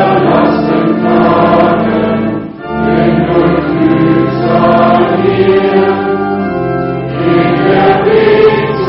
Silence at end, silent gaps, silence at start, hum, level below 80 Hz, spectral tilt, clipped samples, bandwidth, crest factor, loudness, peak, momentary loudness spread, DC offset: 0 s; none; 0 s; none; -36 dBFS; -6 dB/octave; under 0.1%; 5.8 kHz; 8 dB; -9 LUFS; 0 dBFS; 7 LU; under 0.1%